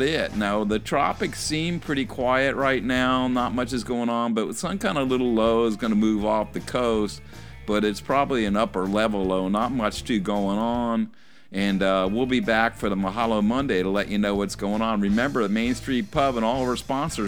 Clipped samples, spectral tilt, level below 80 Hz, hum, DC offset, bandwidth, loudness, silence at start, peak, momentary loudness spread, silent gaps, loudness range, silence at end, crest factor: under 0.1%; -5.5 dB/octave; -44 dBFS; none; 0.5%; 17.5 kHz; -24 LUFS; 0 s; -4 dBFS; 5 LU; none; 1 LU; 0 s; 18 dB